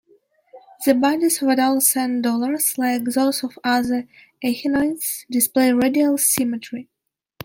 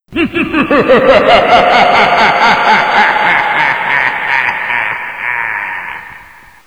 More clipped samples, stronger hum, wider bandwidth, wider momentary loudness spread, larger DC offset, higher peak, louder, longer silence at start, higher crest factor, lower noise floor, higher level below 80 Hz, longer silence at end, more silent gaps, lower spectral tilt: second, under 0.1% vs 0.1%; neither; second, 17 kHz vs over 20 kHz; about the same, 9 LU vs 10 LU; second, under 0.1% vs 0.4%; about the same, -2 dBFS vs 0 dBFS; second, -19 LUFS vs -9 LUFS; first, 0.55 s vs 0.1 s; first, 18 dB vs 10 dB; first, -58 dBFS vs -37 dBFS; second, -62 dBFS vs -40 dBFS; first, 0.6 s vs 0.45 s; neither; second, -2.5 dB/octave vs -4.5 dB/octave